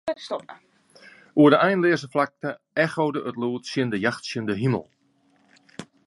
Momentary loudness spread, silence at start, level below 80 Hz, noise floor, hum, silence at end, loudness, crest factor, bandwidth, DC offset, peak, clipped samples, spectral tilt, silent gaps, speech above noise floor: 16 LU; 0.05 s; -64 dBFS; -63 dBFS; none; 0.2 s; -23 LUFS; 20 dB; 11.5 kHz; under 0.1%; -4 dBFS; under 0.1%; -6.5 dB/octave; none; 40 dB